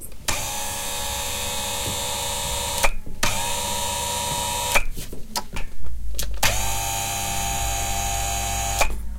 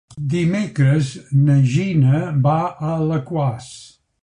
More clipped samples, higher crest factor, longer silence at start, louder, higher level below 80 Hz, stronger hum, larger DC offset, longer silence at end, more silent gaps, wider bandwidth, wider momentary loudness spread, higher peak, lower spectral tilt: neither; first, 20 dB vs 14 dB; second, 0 s vs 0.15 s; second, -24 LUFS vs -18 LUFS; first, -30 dBFS vs -50 dBFS; neither; neither; second, 0 s vs 0.4 s; neither; first, 17 kHz vs 10.5 kHz; about the same, 8 LU vs 7 LU; about the same, -2 dBFS vs -4 dBFS; second, -1.5 dB/octave vs -8 dB/octave